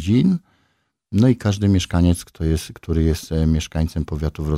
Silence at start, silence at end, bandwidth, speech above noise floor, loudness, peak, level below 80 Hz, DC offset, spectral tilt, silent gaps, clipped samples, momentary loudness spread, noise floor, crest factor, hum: 0 s; 0 s; 15 kHz; 49 dB; -20 LUFS; -4 dBFS; -30 dBFS; under 0.1%; -7 dB/octave; none; under 0.1%; 8 LU; -67 dBFS; 14 dB; none